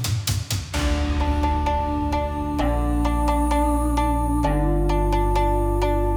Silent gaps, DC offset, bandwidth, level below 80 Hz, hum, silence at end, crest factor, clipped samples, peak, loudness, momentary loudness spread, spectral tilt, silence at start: none; under 0.1%; over 20 kHz; -24 dBFS; 50 Hz at -40 dBFS; 0 s; 14 dB; under 0.1%; -8 dBFS; -23 LUFS; 3 LU; -6 dB/octave; 0 s